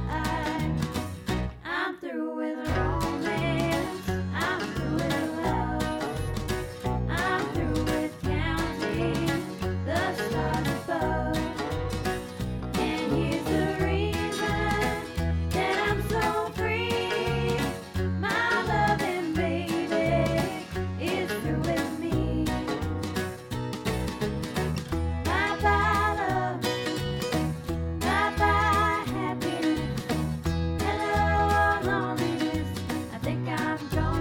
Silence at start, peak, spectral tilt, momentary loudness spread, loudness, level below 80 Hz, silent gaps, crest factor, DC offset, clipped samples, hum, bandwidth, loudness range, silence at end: 0 s; -12 dBFS; -5.5 dB/octave; 7 LU; -28 LUFS; -38 dBFS; none; 16 dB; under 0.1%; under 0.1%; none; 18 kHz; 3 LU; 0 s